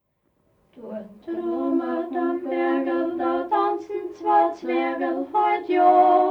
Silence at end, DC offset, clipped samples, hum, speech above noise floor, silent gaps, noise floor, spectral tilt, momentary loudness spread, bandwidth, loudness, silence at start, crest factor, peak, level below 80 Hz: 0 s; under 0.1%; under 0.1%; none; 47 dB; none; -68 dBFS; -6.5 dB/octave; 14 LU; 6.2 kHz; -22 LUFS; 0.75 s; 16 dB; -6 dBFS; -68 dBFS